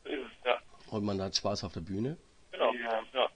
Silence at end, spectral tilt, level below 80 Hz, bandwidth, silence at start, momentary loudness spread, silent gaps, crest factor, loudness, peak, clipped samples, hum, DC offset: 0.05 s; -4.5 dB/octave; -62 dBFS; 10 kHz; 0.05 s; 9 LU; none; 22 dB; -34 LUFS; -12 dBFS; under 0.1%; none; under 0.1%